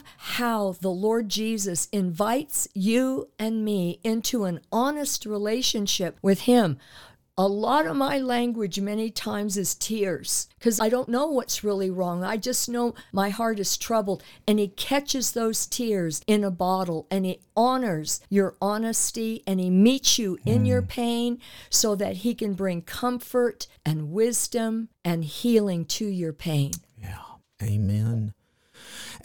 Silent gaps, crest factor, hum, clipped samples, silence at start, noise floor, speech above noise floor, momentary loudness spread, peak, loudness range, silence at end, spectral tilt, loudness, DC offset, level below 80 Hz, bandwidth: none; 18 dB; none; under 0.1%; 0 s; -52 dBFS; 27 dB; 7 LU; -6 dBFS; 3 LU; 0 s; -4.5 dB/octave; -25 LUFS; 0.3%; -56 dBFS; 19 kHz